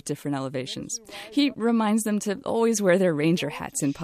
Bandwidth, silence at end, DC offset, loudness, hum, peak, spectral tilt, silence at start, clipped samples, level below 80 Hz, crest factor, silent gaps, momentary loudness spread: 14.5 kHz; 0 s; under 0.1%; -25 LUFS; none; -8 dBFS; -5 dB/octave; 0.05 s; under 0.1%; -64 dBFS; 16 dB; none; 11 LU